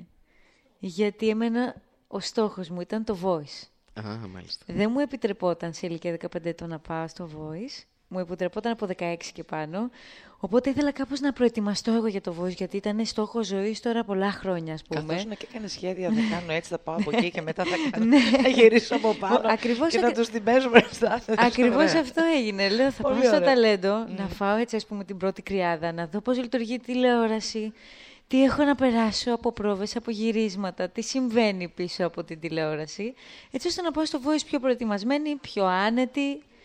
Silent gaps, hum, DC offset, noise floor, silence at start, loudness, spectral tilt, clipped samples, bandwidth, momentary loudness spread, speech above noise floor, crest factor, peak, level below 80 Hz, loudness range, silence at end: none; none; under 0.1%; -61 dBFS; 0 s; -25 LUFS; -5 dB/octave; under 0.1%; 10.5 kHz; 15 LU; 36 dB; 24 dB; 0 dBFS; -56 dBFS; 9 LU; 0.25 s